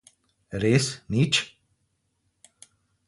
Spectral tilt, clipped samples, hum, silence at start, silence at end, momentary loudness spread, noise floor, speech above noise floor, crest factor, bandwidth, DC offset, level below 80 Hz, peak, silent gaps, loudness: -4.5 dB/octave; under 0.1%; none; 0.5 s; 1.6 s; 13 LU; -74 dBFS; 50 dB; 22 dB; 11.5 kHz; under 0.1%; -56 dBFS; -6 dBFS; none; -24 LUFS